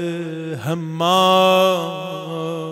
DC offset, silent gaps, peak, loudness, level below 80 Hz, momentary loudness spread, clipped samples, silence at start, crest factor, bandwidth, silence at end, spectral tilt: under 0.1%; none; -2 dBFS; -18 LUFS; -68 dBFS; 14 LU; under 0.1%; 0 s; 16 dB; 16 kHz; 0 s; -5 dB/octave